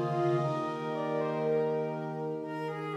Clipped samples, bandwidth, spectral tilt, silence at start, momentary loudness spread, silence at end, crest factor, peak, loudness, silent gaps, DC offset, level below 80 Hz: under 0.1%; 10 kHz; -8 dB/octave; 0 s; 7 LU; 0 s; 14 dB; -18 dBFS; -32 LUFS; none; under 0.1%; -76 dBFS